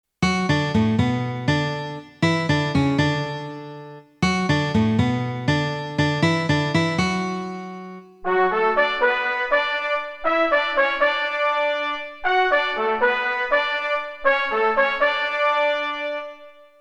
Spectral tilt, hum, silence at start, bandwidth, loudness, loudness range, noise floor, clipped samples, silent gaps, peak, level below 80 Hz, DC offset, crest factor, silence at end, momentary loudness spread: -5.5 dB/octave; none; 0.2 s; 10.5 kHz; -21 LUFS; 3 LU; -44 dBFS; under 0.1%; none; -6 dBFS; -50 dBFS; under 0.1%; 16 dB; 0.3 s; 10 LU